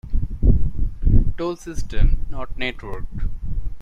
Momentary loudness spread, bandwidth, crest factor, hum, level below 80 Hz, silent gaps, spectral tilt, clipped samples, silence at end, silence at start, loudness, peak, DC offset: 11 LU; 7 kHz; 14 dB; none; -20 dBFS; none; -7 dB/octave; under 0.1%; 0 s; 0.05 s; -25 LUFS; -2 dBFS; under 0.1%